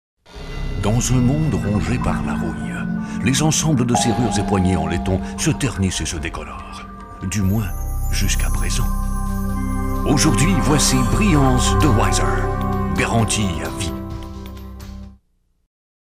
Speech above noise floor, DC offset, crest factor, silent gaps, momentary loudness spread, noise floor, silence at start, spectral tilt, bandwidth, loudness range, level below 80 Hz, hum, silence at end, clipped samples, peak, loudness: 45 dB; under 0.1%; 14 dB; none; 16 LU; -62 dBFS; 0.3 s; -5 dB/octave; 16 kHz; 6 LU; -26 dBFS; none; 0.95 s; under 0.1%; -4 dBFS; -19 LUFS